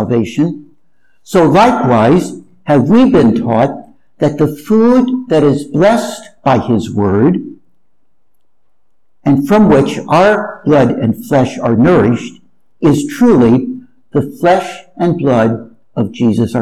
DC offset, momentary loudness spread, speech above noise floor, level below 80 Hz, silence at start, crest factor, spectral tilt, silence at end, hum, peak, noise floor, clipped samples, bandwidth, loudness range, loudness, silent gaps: under 0.1%; 11 LU; 59 dB; -42 dBFS; 0 s; 10 dB; -7.5 dB/octave; 0 s; none; 0 dBFS; -69 dBFS; under 0.1%; 13.5 kHz; 4 LU; -11 LUFS; none